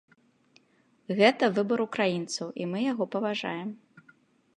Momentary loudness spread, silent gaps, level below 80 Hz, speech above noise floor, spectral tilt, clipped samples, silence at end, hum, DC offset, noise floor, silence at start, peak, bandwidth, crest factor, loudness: 12 LU; none; -80 dBFS; 39 dB; -5 dB/octave; under 0.1%; 0.8 s; none; under 0.1%; -66 dBFS; 1.1 s; -6 dBFS; 11 kHz; 24 dB; -28 LUFS